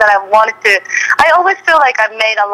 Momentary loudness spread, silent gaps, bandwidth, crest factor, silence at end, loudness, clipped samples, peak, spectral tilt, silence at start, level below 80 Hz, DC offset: 4 LU; none; 15.5 kHz; 10 dB; 0 s; -10 LUFS; 0.4%; 0 dBFS; -1 dB/octave; 0 s; -52 dBFS; under 0.1%